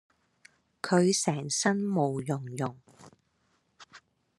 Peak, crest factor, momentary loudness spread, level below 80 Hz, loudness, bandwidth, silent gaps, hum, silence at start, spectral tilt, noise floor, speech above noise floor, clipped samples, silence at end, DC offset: -10 dBFS; 20 dB; 11 LU; -74 dBFS; -29 LUFS; 12.5 kHz; none; none; 0.85 s; -4.5 dB/octave; -73 dBFS; 44 dB; under 0.1%; 0.4 s; under 0.1%